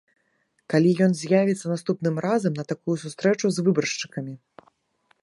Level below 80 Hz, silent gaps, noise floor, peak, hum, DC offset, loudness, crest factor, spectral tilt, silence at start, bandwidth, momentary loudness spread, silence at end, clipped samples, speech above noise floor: -70 dBFS; none; -70 dBFS; -6 dBFS; none; under 0.1%; -23 LUFS; 18 dB; -6 dB/octave; 0.7 s; 11.5 kHz; 10 LU; 0.85 s; under 0.1%; 47 dB